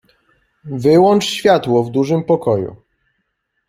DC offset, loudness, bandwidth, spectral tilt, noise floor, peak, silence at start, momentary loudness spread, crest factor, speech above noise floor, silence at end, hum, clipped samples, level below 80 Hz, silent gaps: under 0.1%; -14 LUFS; 15.5 kHz; -6 dB/octave; -70 dBFS; -2 dBFS; 0.65 s; 9 LU; 14 dB; 56 dB; 0.95 s; none; under 0.1%; -56 dBFS; none